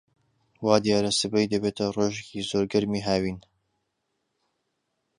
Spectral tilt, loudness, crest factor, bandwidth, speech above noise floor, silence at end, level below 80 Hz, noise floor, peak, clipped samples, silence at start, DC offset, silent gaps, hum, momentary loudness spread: -4.5 dB/octave; -25 LUFS; 24 dB; 11 kHz; 53 dB; 1.8 s; -56 dBFS; -78 dBFS; -4 dBFS; under 0.1%; 0.6 s; under 0.1%; none; none; 9 LU